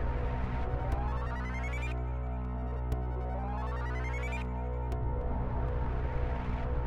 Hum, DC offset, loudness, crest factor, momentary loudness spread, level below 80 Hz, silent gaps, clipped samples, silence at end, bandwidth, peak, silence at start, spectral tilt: none; under 0.1%; -36 LUFS; 14 dB; 2 LU; -34 dBFS; none; under 0.1%; 0 s; 7.6 kHz; -20 dBFS; 0 s; -8 dB/octave